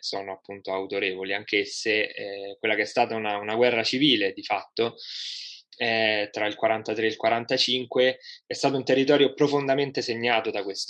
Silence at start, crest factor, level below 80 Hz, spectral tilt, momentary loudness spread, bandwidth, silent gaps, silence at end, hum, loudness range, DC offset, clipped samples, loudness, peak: 0.05 s; 20 dB; -80 dBFS; -4 dB/octave; 12 LU; 10 kHz; none; 0 s; none; 3 LU; under 0.1%; under 0.1%; -25 LUFS; -6 dBFS